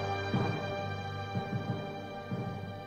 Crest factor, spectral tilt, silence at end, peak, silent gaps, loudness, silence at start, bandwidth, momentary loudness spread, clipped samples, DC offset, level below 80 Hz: 16 dB; -7 dB/octave; 0 s; -20 dBFS; none; -36 LUFS; 0 s; 15 kHz; 7 LU; under 0.1%; under 0.1%; -60 dBFS